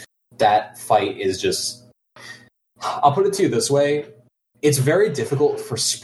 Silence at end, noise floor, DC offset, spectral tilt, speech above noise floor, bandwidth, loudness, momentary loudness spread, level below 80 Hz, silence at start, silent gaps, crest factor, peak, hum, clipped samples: 0.05 s; -47 dBFS; under 0.1%; -4 dB/octave; 28 dB; 12.5 kHz; -20 LUFS; 14 LU; -62 dBFS; 0 s; none; 18 dB; -2 dBFS; none; under 0.1%